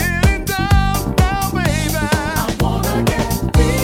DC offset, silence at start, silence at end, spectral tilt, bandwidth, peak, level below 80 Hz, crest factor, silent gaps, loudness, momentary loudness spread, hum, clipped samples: under 0.1%; 0 s; 0 s; -5 dB/octave; 17 kHz; 0 dBFS; -22 dBFS; 16 dB; none; -17 LUFS; 3 LU; none; under 0.1%